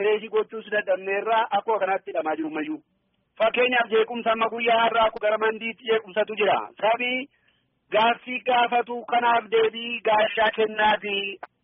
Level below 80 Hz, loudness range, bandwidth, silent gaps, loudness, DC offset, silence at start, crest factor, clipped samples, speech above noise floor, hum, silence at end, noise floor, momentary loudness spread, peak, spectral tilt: -66 dBFS; 2 LU; 4 kHz; none; -23 LUFS; under 0.1%; 0 s; 14 dB; under 0.1%; 44 dB; none; 0.2 s; -67 dBFS; 7 LU; -10 dBFS; 0 dB/octave